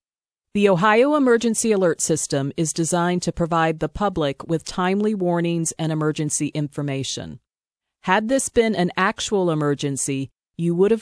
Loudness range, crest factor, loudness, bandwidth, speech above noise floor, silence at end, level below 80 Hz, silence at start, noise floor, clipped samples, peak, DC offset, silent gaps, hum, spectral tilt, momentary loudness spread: 4 LU; 18 dB; -21 LUFS; 11 kHz; 68 dB; 0 s; -50 dBFS; 0.55 s; -88 dBFS; under 0.1%; -4 dBFS; under 0.1%; 7.59-7.71 s, 10.39-10.51 s; none; -4.5 dB/octave; 9 LU